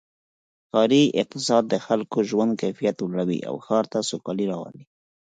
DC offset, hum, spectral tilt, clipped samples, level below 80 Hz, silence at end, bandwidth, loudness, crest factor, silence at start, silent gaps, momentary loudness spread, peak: under 0.1%; none; -5 dB/octave; under 0.1%; -70 dBFS; 0.4 s; 9.4 kHz; -23 LUFS; 18 dB; 0.75 s; none; 9 LU; -6 dBFS